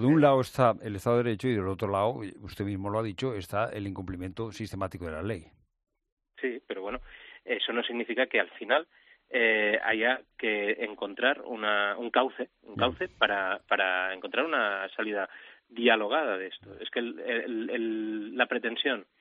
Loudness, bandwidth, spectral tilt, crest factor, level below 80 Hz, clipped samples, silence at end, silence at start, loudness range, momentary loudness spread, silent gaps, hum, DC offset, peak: -29 LUFS; 12.5 kHz; -6 dB/octave; 22 dB; -60 dBFS; under 0.1%; 0.15 s; 0 s; 8 LU; 12 LU; 6.12-6.17 s; none; under 0.1%; -8 dBFS